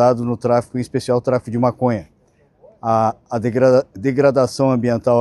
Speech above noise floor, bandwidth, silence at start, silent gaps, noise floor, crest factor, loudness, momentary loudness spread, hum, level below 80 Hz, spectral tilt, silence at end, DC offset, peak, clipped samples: 40 dB; 12 kHz; 0 s; none; -56 dBFS; 16 dB; -18 LUFS; 8 LU; none; -54 dBFS; -7.5 dB/octave; 0 s; under 0.1%; -2 dBFS; under 0.1%